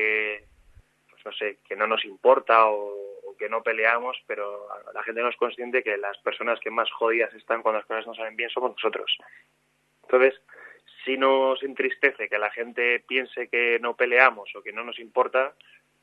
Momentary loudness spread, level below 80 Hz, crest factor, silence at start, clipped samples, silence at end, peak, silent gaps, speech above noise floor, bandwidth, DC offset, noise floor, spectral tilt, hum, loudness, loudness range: 14 LU; -72 dBFS; 24 dB; 0 s; under 0.1%; 0.5 s; -2 dBFS; none; 40 dB; 5.2 kHz; under 0.1%; -64 dBFS; -4.5 dB/octave; none; -24 LUFS; 4 LU